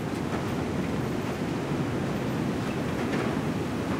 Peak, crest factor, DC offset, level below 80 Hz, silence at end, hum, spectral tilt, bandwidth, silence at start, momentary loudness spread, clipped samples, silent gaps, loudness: -16 dBFS; 12 dB; under 0.1%; -50 dBFS; 0 s; none; -6.5 dB/octave; 16 kHz; 0 s; 2 LU; under 0.1%; none; -29 LUFS